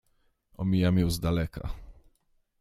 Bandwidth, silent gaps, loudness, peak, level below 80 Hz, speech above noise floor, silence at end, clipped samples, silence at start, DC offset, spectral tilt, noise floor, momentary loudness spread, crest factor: 15 kHz; none; -28 LUFS; -12 dBFS; -42 dBFS; 43 dB; 0.7 s; under 0.1%; 0.6 s; under 0.1%; -7 dB/octave; -70 dBFS; 16 LU; 18 dB